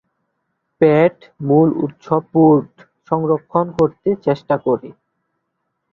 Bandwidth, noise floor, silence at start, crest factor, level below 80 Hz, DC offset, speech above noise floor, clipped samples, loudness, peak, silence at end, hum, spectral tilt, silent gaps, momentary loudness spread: 6.4 kHz; -73 dBFS; 0.8 s; 16 dB; -56 dBFS; under 0.1%; 58 dB; under 0.1%; -17 LUFS; -2 dBFS; 1 s; none; -10 dB/octave; none; 8 LU